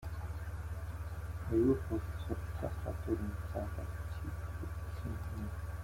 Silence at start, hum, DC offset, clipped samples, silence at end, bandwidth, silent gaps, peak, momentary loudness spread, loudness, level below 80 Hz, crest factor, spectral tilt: 0 s; none; under 0.1%; under 0.1%; 0 s; 16.5 kHz; none; -20 dBFS; 11 LU; -39 LUFS; -46 dBFS; 18 dB; -8 dB/octave